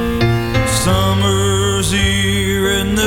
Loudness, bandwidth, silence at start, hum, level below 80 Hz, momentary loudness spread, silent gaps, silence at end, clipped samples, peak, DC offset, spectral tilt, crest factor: -15 LUFS; 17.5 kHz; 0 s; none; -26 dBFS; 2 LU; none; 0 s; under 0.1%; -2 dBFS; under 0.1%; -4.5 dB/octave; 12 dB